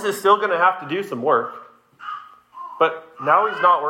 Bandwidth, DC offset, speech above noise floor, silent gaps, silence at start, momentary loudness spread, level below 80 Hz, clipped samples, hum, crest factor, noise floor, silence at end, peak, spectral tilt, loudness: 16 kHz; under 0.1%; 20 dB; none; 0 s; 19 LU; -74 dBFS; under 0.1%; none; 18 dB; -39 dBFS; 0 s; -4 dBFS; -4 dB/octave; -19 LUFS